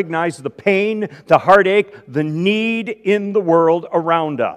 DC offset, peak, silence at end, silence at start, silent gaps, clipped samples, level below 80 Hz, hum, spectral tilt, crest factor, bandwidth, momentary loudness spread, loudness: under 0.1%; 0 dBFS; 0 s; 0 s; none; 0.1%; -60 dBFS; none; -6.5 dB/octave; 16 dB; 11.5 kHz; 10 LU; -16 LUFS